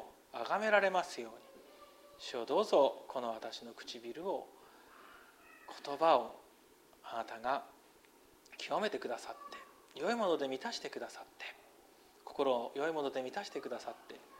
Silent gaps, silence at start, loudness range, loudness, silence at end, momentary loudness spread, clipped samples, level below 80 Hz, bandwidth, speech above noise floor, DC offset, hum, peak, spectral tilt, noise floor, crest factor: none; 0 s; 6 LU; -37 LUFS; 0 s; 26 LU; under 0.1%; -80 dBFS; 16 kHz; 28 dB; under 0.1%; none; -16 dBFS; -3.5 dB/octave; -64 dBFS; 22 dB